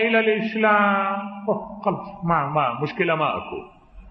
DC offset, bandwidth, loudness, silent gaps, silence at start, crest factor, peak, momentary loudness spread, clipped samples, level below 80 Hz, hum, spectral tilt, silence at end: under 0.1%; 6 kHz; -22 LUFS; none; 0 s; 18 dB; -6 dBFS; 10 LU; under 0.1%; -54 dBFS; none; -8.5 dB/octave; 0 s